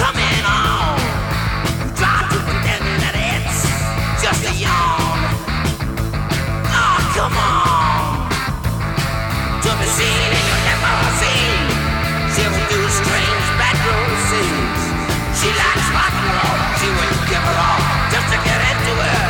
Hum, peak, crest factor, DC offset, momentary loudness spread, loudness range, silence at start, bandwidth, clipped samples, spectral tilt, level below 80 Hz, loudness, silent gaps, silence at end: none; -2 dBFS; 14 dB; under 0.1%; 5 LU; 2 LU; 0 s; 19 kHz; under 0.1%; -4 dB/octave; -26 dBFS; -16 LUFS; none; 0 s